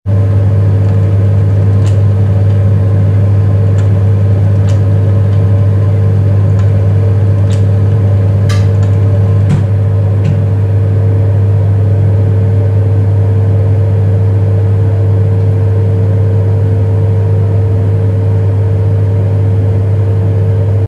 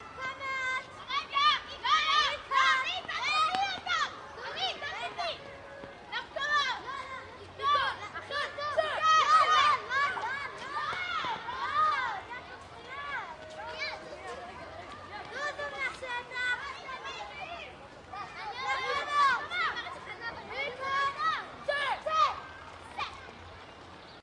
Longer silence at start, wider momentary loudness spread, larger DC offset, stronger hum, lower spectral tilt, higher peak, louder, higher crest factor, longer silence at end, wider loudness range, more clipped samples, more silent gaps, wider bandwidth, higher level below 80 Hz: about the same, 0.05 s vs 0 s; second, 1 LU vs 18 LU; neither; neither; first, -9.5 dB/octave vs -1.5 dB/octave; first, 0 dBFS vs -12 dBFS; first, -10 LUFS vs -30 LUFS; second, 8 dB vs 20 dB; about the same, 0 s vs 0 s; second, 1 LU vs 9 LU; neither; neither; second, 4.1 kHz vs 11 kHz; first, -32 dBFS vs -64 dBFS